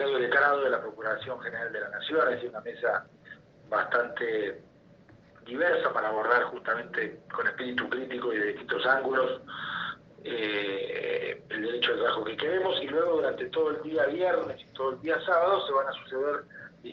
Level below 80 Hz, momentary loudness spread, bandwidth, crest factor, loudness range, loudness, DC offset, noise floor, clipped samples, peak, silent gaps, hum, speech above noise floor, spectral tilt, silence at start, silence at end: -72 dBFS; 10 LU; 6.2 kHz; 20 dB; 3 LU; -29 LUFS; under 0.1%; -56 dBFS; under 0.1%; -10 dBFS; none; none; 27 dB; -6 dB/octave; 0 s; 0 s